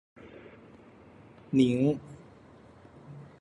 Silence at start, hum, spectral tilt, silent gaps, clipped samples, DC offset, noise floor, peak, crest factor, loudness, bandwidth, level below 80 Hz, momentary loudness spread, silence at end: 0.25 s; none; -8 dB/octave; none; under 0.1%; under 0.1%; -54 dBFS; -12 dBFS; 22 dB; -27 LUFS; 10 kHz; -64 dBFS; 26 LU; 0.2 s